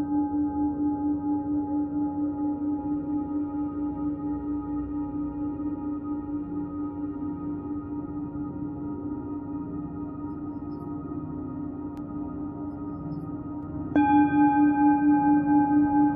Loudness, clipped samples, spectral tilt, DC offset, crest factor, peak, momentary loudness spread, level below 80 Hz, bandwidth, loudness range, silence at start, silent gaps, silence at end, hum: -28 LUFS; under 0.1%; -8.5 dB/octave; under 0.1%; 16 dB; -10 dBFS; 14 LU; -50 dBFS; 3.6 kHz; 11 LU; 0 s; none; 0 s; none